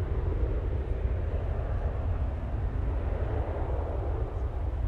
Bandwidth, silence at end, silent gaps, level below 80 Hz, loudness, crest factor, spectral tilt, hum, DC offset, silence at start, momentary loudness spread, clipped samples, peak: 4.2 kHz; 0 s; none; -32 dBFS; -32 LUFS; 12 dB; -10 dB/octave; none; under 0.1%; 0 s; 2 LU; under 0.1%; -18 dBFS